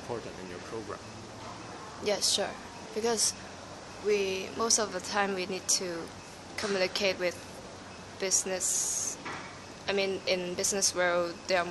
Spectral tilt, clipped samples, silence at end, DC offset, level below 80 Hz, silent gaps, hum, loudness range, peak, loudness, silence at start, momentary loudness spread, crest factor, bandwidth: -1.5 dB/octave; under 0.1%; 0 s; under 0.1%; -64 dBFS; none; none; 3 LU; -8 dBFS; -30 LUFS; 0 s; 17 LU; 24 dB; 12 kHz